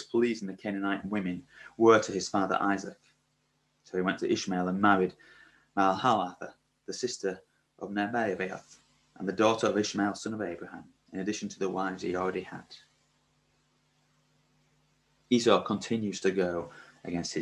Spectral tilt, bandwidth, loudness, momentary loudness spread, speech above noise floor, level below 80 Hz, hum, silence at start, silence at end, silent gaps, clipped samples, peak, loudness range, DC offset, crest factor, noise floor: -5 dB/octave; 11 kHz; -30 LUFS; 19 LU; 44 dB; -66 dBFS; none; 0 s; 0 s; none; under 0.1%; -8 dBFS; 7 LU; under 0.1%; 24 dB; -74 dBFS